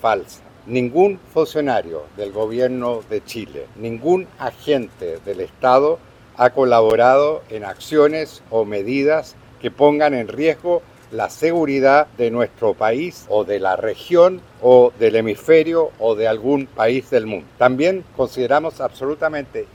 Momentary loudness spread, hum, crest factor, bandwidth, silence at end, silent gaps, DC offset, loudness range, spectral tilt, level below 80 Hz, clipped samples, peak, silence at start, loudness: 13 LU; none; 18 dB; 16.5 kHz; 0.1 s; none; under 0.1%; 6 LU; -6 dB/octave; -54 dBFS; under 0.1%; 0 dBFS; 0.05 s; -18 LUFS